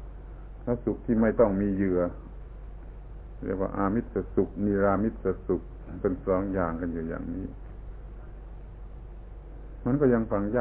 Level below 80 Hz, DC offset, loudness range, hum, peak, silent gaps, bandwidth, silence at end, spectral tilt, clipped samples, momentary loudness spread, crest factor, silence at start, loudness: -42 dBFS; under 0.1%; 5 LU; none; -10 dBFS; none; 3.6 kHz; 0 s; -13 dB/octave; under 0.1%; 22 LU; 20 dB; 0 s; -28 LUFS